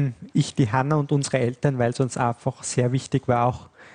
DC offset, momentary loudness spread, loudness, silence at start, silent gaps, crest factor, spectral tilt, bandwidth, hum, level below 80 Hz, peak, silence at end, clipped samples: under 0.1%; 3 LU; -23 LUFS; 0 s; none; 16 dB; -6 dB/octave; 10 kHz; none; -56 dBFS; -6 dBFS; 0.1 s; under 0.1%